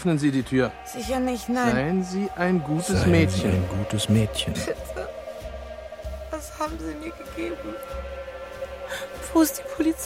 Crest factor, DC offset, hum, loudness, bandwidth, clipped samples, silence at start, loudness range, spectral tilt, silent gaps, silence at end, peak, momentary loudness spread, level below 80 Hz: 18 dB; under 0.1%; none; -26 LUFS; 16.5 kHz; under 0.1%; 0 s; 11 LU; -5.5 dB/octave; none; 0 s; -6 dBFS; 15 LU; -42 dBFS